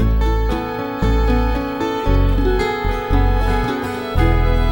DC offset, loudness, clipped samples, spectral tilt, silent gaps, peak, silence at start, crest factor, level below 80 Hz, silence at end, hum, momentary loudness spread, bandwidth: under 0.1%; -19 LUFS; under 0.1%; -7.5 dB/octave; none; -2 dBFS; 0 s; 14 dB; -18 dBFS; 0 s; none; 5 LU; 16.5 kHz